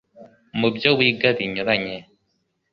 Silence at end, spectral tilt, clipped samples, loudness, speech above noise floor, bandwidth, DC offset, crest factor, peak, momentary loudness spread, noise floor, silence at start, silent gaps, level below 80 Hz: 0.7 s; -7 dB/octave; under 0.1%; -20 LUFS; 51 dB; 6.6 kHz; under 0.1%; 22 dB; 0 dBFS; 15 LU; -71 dBFS; 0.15 s; none; -60 dBFS